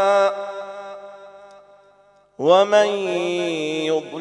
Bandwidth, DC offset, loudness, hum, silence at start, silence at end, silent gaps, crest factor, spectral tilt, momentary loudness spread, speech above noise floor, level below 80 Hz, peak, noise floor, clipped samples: 11 kHz; under 0.1%; -19 LUFS; 50 Hz at -60 dBFS; 0 s; 0 s; none; 18 dB; -4 dB/octave; 20 LU; 36 dB; -78 dBFS; -2 dBFS; -55 dBFS; under 0.1%